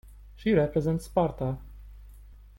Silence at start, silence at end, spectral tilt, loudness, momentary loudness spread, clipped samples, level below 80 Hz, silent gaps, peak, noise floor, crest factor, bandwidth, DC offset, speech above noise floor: 0.05 s; 0.25 s; -8 dB/octave; -28 LUFS; 9 LU; under 0.1%; -46 dBFS; none; -12 dBFS; -49 dBFS; 18 dB; 16.5 kHz; under 0.1%; 23 dB